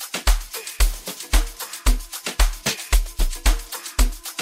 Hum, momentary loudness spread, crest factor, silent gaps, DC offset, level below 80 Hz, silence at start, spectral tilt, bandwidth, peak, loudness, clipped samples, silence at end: none; 6 LU; 18 dB; none; under 0.1%; -22 dBFS; 0 s; -2.5 dB/octave; 16.5 kHz; -4 dBFS; -24 LUFS; under 0.1%; 0 s